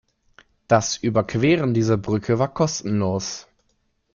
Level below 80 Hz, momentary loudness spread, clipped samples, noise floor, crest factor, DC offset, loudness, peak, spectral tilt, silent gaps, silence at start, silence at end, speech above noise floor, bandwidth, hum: -52 dBFS; 6 LU; under 0.1%; -68 dBFS; 18 dB; under 0.1%; -21 LUFS; -4 dBFS; -5.5 dB/octave; none; 0.7 s; 0.7 s; 48 dB; 7.4 kHz; none